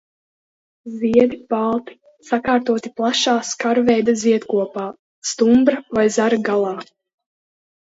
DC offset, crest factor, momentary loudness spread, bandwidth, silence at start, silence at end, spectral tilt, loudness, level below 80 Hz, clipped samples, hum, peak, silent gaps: under 0.1%; 18 dB; 11 LU; 8 kHz; 0.85 s; 1 s; -4 dB/octave; -18 LUFS; -58 dBFS; under 0.1%; none; -2 dBFS; 4.99-5.22 s